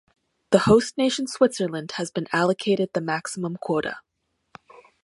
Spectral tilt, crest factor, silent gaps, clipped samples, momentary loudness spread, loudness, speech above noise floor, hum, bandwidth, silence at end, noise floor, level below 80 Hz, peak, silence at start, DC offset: -5 dB/octave; 22 dB; none; under 0.1%; 11 LU; -23 LUFS; 29 dB; none; 11.5 kHz; 1.05 s; -52 dBFS; -56 dBFS; -2 dBFS; 0.5 s; under 0.1%